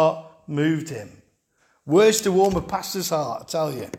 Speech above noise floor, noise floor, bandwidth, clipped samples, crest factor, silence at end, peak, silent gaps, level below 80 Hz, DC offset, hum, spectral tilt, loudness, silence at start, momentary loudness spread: 44 dB; -65 dBFS; 17 kHz; under 0.1%; 18 dB; 0 s; -6 dBFS; none; -50 dBFS; under 0.1%; none; -4.5 dB/octave; -22 LUFS; 0 s; 14 LU